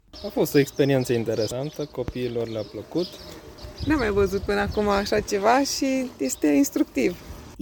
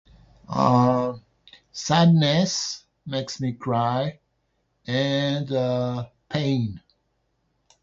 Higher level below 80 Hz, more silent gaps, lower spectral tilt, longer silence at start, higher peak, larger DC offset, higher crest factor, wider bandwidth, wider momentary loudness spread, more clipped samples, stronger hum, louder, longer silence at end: first, -44 dBFS vs -58 dBFS; neither; about the same, -5 dB/octave vs -5.5 dB/octave; second, 0.15 s vs 0.5 s; about the same, -6 dBFS vs -6 dBFS; neither; about the same, 18 dB vs 18 dB; first, 19 kHz vs 7.8 kHz; second, 12 LU vs 15 LU; neither; neither; about the same, -24 LUFS vs -23 LUFS; second, 0 s vs 1.05 s